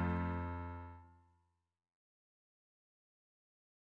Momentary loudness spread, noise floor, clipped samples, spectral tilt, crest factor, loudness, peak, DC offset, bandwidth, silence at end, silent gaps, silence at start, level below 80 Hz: 17 LU; -84 dBFS; under 0.1%; -10 dB/octave; 20 dB; -42 LUFS; -26 dBFS; under 0.1%; 4.3 kHz; 2.85 s; none; 0 s; -58 dBFS